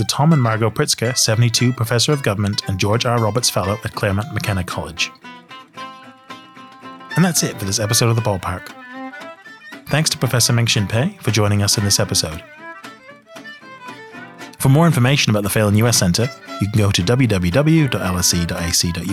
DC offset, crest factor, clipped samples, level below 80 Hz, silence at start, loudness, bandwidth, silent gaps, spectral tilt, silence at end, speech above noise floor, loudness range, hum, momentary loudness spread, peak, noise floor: under 0.1%; 16 dB; under 0.1%; -44 dBFS; 0 s; -17 LUFS; 16 kHz; none; -4 dB/octave; 0 s; 23 dB; 6 LU; none; 21 LU; -2 dBFS; -40 dBFS